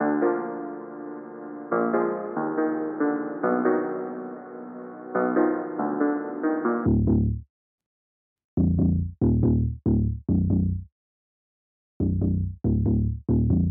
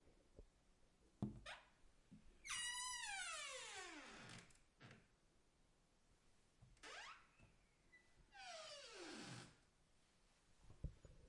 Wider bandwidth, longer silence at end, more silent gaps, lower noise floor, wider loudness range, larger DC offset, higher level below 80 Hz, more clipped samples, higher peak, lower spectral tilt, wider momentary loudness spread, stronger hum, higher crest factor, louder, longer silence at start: second, 2.5 kHz vs 12 kHz; about the same, 0 s vs 0 s; first, 7.50-7.78 s, 7.86-8.36 s, 8.44-8.57 s, 10.92-12.00 s vs none; first, under -90 dBFS vs -77 dBFS; second, 2 LU vs 14 LU; neither; first, -36 dBFS vs -70 dBFS; neither; first, -10 dBFS vs -34 dBFS; first, -7 dB/octave vs -2 dB/octave; second, 15 LU vs 18 LU; neither; second, 16 dB vs 24 dB; first, -25 LUFS vs -52 LUFS; about the same, 0 s vs 0 s